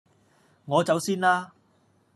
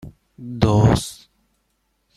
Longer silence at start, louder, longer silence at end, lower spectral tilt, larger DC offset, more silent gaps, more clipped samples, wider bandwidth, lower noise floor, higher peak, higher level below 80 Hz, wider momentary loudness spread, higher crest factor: first, 0.65 s vs 0.05 s; second, -24 LUFS vs -18 LUFS; second, 0.7 s vs 1.05 s; second, -4.5 dB/octave vs -6.5 dB/octave; neither; neither; neither; about the same, 13.5 kHz vs 13 kHz; second, -64 dBFS vs -69 dBFS; second, -8 dBFS vs -2 dBFS; second, -76 dBFS vs -38 dBFS; second, 5 LU vs 20 LU; about the same, 20 dB vs 20 dB